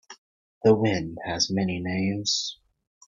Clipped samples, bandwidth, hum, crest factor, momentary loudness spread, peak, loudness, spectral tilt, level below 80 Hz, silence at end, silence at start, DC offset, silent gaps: under 0.1%; 7.6 kHz; none; 20 dB; 8 LU; -6 dBFS; -25 LUFS; -4.5 dB/octave; -58 dBFS; 0.55 s; 0.1 s; under 0.1%; 0.18-0.61 s